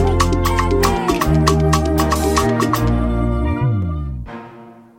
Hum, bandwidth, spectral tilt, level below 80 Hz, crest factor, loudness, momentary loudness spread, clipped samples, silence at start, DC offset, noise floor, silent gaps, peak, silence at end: none; 17 kHz; -6 dB/octave; -24 dBFS; 14 dB; -17 LUFS; 10 LU; under 0.1%; 0 s; under 0.1%; -40 dBFS; none; -2 dBFS; 0.25 s